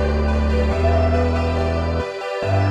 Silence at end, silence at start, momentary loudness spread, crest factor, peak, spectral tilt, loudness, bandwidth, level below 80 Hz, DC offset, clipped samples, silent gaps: 0 s; 0 s; 6 LU; 12 dB; -6 dBFS; -7.5 dB/octave; -20 LUFS; 8.4 kHz; -24 dBFS; under 0.1%; under 0.1%; none